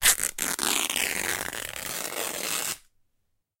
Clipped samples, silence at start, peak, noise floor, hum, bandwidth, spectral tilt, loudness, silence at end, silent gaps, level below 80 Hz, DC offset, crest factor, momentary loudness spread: under 0.1%; 0 s; -2 dBFS; -74 dBFS; none; 17 kHz; 0.5 dB/octave; -27 LUFS; 0.8 s; none; -54 dBFS; under 0.1%; 28 dB; 8 LU